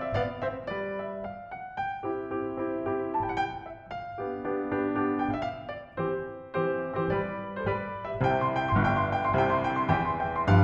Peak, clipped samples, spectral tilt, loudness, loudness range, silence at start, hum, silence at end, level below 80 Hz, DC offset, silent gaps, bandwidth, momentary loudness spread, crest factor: -8 dBFS; under 0.1%; -8.5 dB/octave; -30 LUFS; 6 LU; 0 s; none; 0 s; -50 dBFS; under 0.1%; none; 7.2 kHz; 11 LU; 22 dB